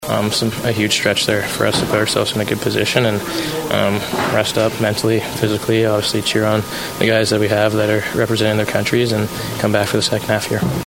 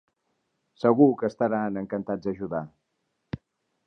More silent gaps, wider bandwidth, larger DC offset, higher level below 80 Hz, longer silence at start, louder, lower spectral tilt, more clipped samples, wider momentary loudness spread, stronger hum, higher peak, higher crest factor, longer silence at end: neither; first, 16.5 kHz vs 6.4 kHz; neither; first, -44 dBFS vs -62 dBFS; second, 0 s vs 0.8 s; first, -17 LUFS vs -25 LUFS; second, -4.5 dB/octave vs -9.5 dB/octave; neither; second, 4 LU vs 20 LU; neither; first, 0 dBFS vs -6 dBFS; about the same, 16 dB vs 20 dB; second, 0 s vs 0.5 s